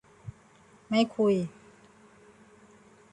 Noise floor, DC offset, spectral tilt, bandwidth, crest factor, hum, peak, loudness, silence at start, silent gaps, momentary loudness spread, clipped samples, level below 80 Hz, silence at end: -58 dBFS; under 0.1%; -6.5 dB/octave; 10.5 kHz; 20 dB; none; -12 dBFS; -28 LUFS; 0.25 s; none; 23 LU; under 0.1%; -66 dBFS; 1.65 s